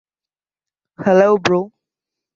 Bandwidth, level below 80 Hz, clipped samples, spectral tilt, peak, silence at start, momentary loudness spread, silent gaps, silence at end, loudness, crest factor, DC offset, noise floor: 7.6 kHz; -60 dBFS; under 0.1%; -6 dB/octave; -2 dBFS; 1 s; 11 LU; none; 0.7 s; -15 LUFS; 18 dB; under 0.1%; under -90 dBFS